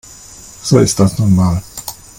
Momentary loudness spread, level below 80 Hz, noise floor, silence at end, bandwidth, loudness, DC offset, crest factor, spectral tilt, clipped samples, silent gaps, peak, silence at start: 22 LU; -38 dBFS; -36 dBFS; 0.25 s; 17 kHz; -13 LUFS; under 0.1%; 14 dB; -6 dB/octave; under 0.1%; none; 0 dBFS; 0.3 s